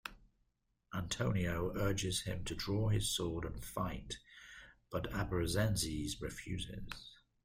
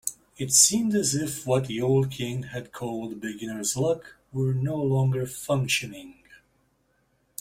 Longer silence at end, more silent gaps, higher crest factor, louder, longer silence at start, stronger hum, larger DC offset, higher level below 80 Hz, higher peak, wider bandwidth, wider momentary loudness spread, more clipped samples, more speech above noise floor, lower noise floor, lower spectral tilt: second, 0.3 s vs 1.05 s; neither; about the same, 18 dB vs 22 dB; second, -38 LUFS vs -25 LUFS; about the same, 0.05 s vs 0.05 s; neither; neither; first, -52 dBFS vs -60 dBFS; second, -22 dBFS vs -6 dBFS; about the same, 16 kHz vs 16 kHz; about the same, 15 LU vs 16 LU; neither; about the same, 42 dB vs 43 dB; first, -80 dBFS vs -69 dBFS; about the same, -4.5 dB/octave vs -4 dB/octave